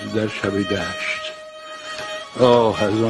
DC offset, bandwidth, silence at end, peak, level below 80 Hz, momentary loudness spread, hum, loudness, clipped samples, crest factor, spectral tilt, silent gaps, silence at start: under 0.1%; 12 kHz; 0 s; -2 dBFS; -52 dBFS; 17 LU; none; -20 LUFS; under 0.1%; 18 dB; -5.5 dB/octave; none; 0 s